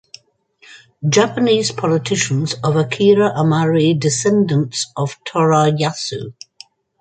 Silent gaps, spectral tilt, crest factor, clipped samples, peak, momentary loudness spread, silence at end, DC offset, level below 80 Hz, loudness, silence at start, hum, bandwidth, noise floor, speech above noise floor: none; -5 dB/octave; 16 dB; under 0.1%; -2 dBFS; 9 LU; 0.7 s; under 0.1%; -58 dBFS; -16 LUFS; 0.7 s; none; 9.4 kHz; -53 dBFS; 37 dB